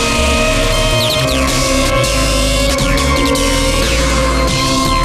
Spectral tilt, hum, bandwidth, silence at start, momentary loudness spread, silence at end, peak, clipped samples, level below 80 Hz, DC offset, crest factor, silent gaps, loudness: -3.5 dB/octave; none; 15.5 kHz; 0 s; 1 LU; 0 s; -2 dBFS; under 0.1%; -18 dBFS; under 0.1%; 12 dB; none; -13 LUFS